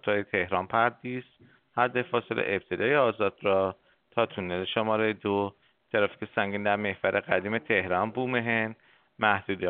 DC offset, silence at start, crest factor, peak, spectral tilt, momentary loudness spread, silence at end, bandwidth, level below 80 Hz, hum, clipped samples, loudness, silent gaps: under 0.1%; 0.05 s; 22 dB; -6 dBFS; -3 dB/octave; 7 LU; 0 s; 4.5 kHz; -68 dBFS; none; under 0.1%; -28 LUFS; none